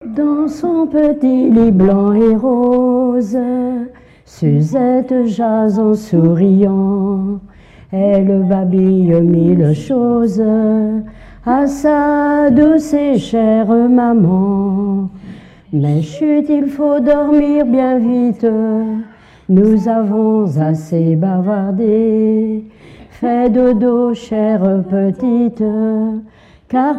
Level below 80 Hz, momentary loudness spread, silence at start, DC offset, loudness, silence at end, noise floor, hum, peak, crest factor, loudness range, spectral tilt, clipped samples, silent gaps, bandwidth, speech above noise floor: -42 dBFS; 7 LU; 0 s; under 0.1%; -13 LUFS; 0 s; -34 dBFS; none; 0 dBFS; 12 dB; 3 LU; -9.5 dB/octave; under 0.1%; none; 8.6 kHz; 22 dB